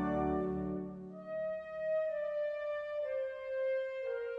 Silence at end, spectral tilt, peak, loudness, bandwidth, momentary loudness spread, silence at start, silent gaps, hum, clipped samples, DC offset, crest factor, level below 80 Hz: 0 s; -9 dB/octave; -24 dBFS; -38 LUFS; 5.6 kHz; 6 LU; 0 s; none; none; under 0.1%; under 0.1%; 14 dB; -58 dBFS